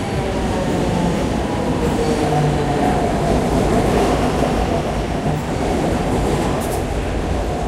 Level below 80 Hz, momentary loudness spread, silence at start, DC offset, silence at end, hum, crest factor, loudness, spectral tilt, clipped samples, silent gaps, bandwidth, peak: -26 dBFS; 5 LU; 0 s; under 0.1%; 0 s; none; 14 dB; -19 LUFS; -6 dB/octave; under 0.1%; none; 16 kHz; -4 dBFS